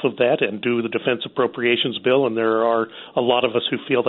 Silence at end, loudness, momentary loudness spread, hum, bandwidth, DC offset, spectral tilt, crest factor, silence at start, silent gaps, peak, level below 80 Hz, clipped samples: 0 s; -20 LUFS; 4 LU; none; 4.2 kHz; under 0.1%; -2.5 dB/octave; 18 dB; 0 s; none; -2 dBFS; -66 dBFS; under 0.1%